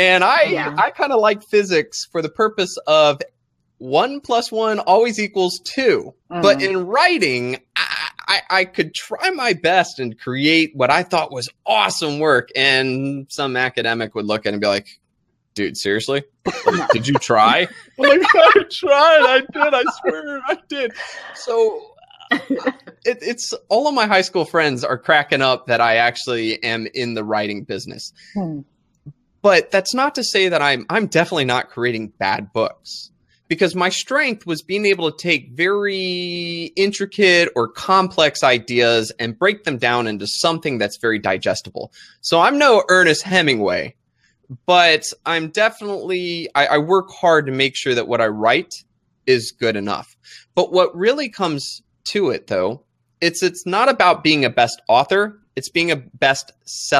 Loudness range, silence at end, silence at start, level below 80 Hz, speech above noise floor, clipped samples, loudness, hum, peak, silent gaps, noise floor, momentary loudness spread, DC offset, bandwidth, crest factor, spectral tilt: 6 LU; 0 s; 0 s; -62 dBFS; 51 dB; under 0.1%; -17 LUFS; none; 0 dBFS; none; -68 dBFS; 12 LU; under 0.1%; 14 kHz; 18 dB; -3.5 dB/octave